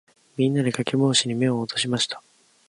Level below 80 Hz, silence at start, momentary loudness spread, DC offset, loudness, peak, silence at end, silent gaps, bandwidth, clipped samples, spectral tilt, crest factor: -66 dBFS; 0.4 s; 7 LU; under 0.1%; -23 LUFS; -4 dBFS; 0.5 s; none; 11.5 kHz; under 0.1%; -4.5 dB/octave; 20 dB